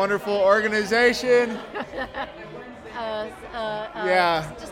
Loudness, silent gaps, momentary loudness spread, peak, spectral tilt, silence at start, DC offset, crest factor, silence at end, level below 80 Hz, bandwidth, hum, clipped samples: -23 LUFS; none; 15 LU; -4 dBFS; -4 dB/octave; 0 s; under 0.1%; 18 dB; 0 s; -52 dBFS; 16.5 kHz; none; under 0.1%